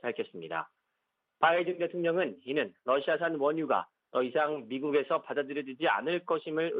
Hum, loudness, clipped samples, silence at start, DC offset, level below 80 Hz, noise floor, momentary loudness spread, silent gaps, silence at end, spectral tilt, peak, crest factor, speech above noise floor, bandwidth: none; -31 LUFS; under 0.1%; 0.05 s; under 0.1%; -82 dBFS; -83 dBFS; 8 LU; none; 0 s; -8.5 dB/octave; -10 dBFS; 20 dB; 52 dB; 4.9 kHz